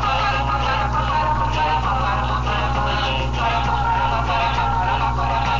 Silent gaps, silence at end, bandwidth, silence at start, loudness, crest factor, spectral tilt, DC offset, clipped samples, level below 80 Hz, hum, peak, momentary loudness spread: none; 0 s; 7.6 kHz; 0 s; -20 LUFS; 12 dB; -5.5 dB/octave; under 0.1%; under 0.1%; -26 dBFS; 60 Hz at -25 dBFS; -8 dBFS; 2 LU